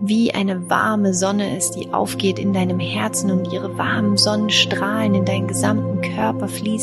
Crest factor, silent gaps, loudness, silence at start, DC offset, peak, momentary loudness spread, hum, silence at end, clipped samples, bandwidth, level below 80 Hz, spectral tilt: 16 dB; none; -19 LUFS; 0 s; under 0.1%; -2 dBFS; 6 LU; none; 0 s; under 0.1%; 12.5 kHz; -56 dBFS; -4.5 dB/octave